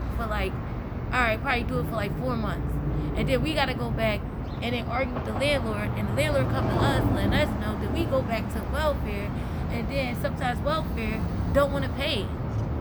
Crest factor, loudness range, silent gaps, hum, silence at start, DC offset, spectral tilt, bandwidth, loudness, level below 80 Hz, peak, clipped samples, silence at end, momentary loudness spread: 18 dB; 2 LU; none; none; 0 s; under 0.1%; -6.5 dB/octave; over 20 kHz; -27 LUFS; -34 dBFS; -8 dBFS; under 0.1%; 0 s; 6 LU